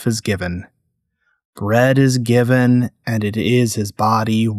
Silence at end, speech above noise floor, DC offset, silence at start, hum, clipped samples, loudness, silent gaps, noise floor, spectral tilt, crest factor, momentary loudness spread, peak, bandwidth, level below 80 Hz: 0 s; 54 dB; under 0.1%; 0 s; none; under 0.1%; -17 LUFS; 1.45-1.53 s; -70 dBFS; -6 dB/octave; 14 dB; 9 LU; -4 dBFS; 14 kHz; -50 dBFS